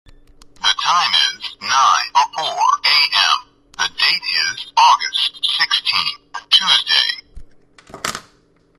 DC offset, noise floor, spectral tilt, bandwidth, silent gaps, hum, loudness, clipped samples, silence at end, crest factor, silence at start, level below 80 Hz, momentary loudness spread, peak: under 0.1%; -55 dBFS; 1.5 dB/octave; 13 kHz; none; none; -15 LUFS; under 0.1%; 0.6 s; 18 dB; 0.6 s; -50 dBFS; 13 LU; 0 dBFS